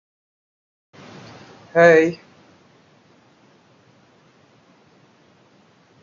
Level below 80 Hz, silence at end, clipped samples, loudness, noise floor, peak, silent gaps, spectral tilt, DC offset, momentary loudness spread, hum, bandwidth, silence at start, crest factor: -70 dBFS; 3.9 s; under 0.1%; -15 LUFS; -55 dBFS; -2 dBFS; none; -6 dB/octave; under 0.1%; 30 LU; none; 7.2 kHz; 1.75 s; 22 dB